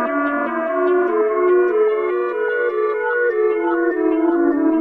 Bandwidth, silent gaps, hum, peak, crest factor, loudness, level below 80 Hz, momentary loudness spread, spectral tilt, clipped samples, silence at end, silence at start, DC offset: 4 kHz; none; none; -6 dBFS; 10 dB; -18 LUFS; -60 dBFS; 5 LU; -7 dB/octave; under 0.1%; 0 s; 0 s; under 0.1%